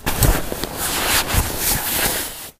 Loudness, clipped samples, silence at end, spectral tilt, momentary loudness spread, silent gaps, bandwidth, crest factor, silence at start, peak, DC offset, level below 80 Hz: -19 LUFS; under 0.1%; 0.1 s; -2.5 dB/octave; 6 LU; none; 16 kHz; 20 dB; 0 s; 0 dBFS; under 0.1%; -26 dBFS